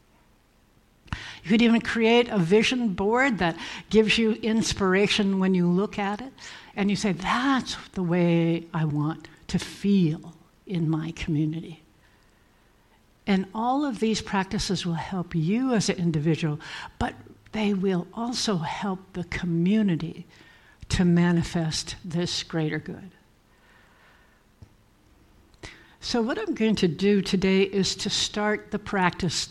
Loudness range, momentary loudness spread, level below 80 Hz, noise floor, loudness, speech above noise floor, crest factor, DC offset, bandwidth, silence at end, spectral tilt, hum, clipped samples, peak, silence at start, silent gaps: 8 LU; 14 LU; -50 dBFS; -60 dBFS; -25 LUFS; 36 dB; 20 dB; under 0.1%; 12 kHz; 0 s; -5.5 dB/octave; none; under 0.1%; -6 dBFS; 1.1 s; none